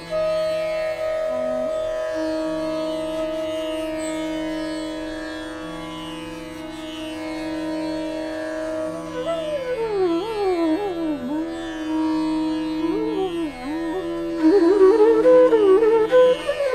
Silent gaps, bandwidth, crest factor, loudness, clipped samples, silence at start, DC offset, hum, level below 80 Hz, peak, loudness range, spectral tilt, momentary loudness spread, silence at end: none; 14 kHz; 16 dB; -22 LUFS; under 0.1%; 0 s; under 0.1%; none; -48 dBFS; -6 dBFS; 12 LU; -5.5 dB/octave; 16 LU; 0 s